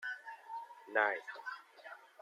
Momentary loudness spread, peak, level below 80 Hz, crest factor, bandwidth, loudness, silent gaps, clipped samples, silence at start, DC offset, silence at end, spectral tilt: 20 LU; -16 dBFS; under -90 dBFS; 24 dB; 14.5 kHz; -39 LUFS; none; under 0.1%; 0 s; under 0.1%; 0.15 s; -2 dB/octave